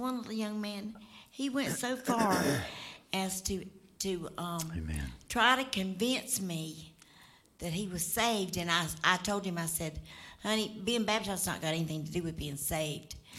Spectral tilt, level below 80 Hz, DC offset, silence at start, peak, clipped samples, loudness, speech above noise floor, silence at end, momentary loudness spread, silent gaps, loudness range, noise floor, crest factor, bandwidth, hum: -3.5 dB/octave; -54 dBFS; under 0.1%; 0 s; -10 dBFS; under 0.1%; -33 LUFS; 26 dB; 0 s; 13 LU; none; 2 LU; -60 dBFS; 24 dB; 16.5 kHz; none